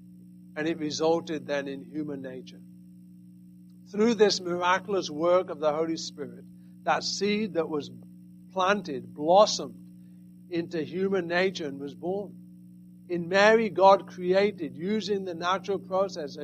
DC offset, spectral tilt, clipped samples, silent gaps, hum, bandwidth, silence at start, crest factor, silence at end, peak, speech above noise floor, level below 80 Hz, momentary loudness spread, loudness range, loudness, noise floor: under 0.1%; -4.5 dB/octave; under 0.1%; none; 60 Hz at -45 dBFS; 14.5 kHz; 0 s; 22 dB; 0 s; -6 dBFS; 24 dB; -72 dBFS; 16 LU; 7 LU; -27 LUFS; -50 dBFS